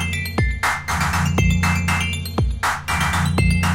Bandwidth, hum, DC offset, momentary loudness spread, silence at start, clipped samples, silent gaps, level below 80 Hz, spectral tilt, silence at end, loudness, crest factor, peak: 17 kHz; none; under 0.1%; 4 LU; 0 s; under 0.1%; none; -28 dBFS; -4.5 dB/octave; 0 s; -20 LUFS; 12 dB; -6 dBFS